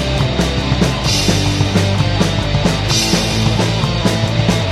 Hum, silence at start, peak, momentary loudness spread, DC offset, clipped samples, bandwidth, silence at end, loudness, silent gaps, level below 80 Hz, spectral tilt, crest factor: none; 0 s; 0 dBFS; 2 LU; under 0.1%; under 0.1%; 15 kHz; 0 s; -15 LUFS; none; -26 dBFS; -4.5 dB/octave; 14 dB